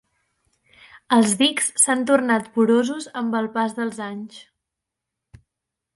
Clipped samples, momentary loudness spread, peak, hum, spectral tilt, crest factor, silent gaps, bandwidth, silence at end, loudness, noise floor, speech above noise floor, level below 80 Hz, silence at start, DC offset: under 0.1%; 13 LU; -2 dBFS; none; -2.5 dB/octave; 20 dB; none; 11.5 kHz; 1.55 s; -20 LUFS; -84 dBFS; 63 dB; -66 dBFS; 1.1 s; under 0.1%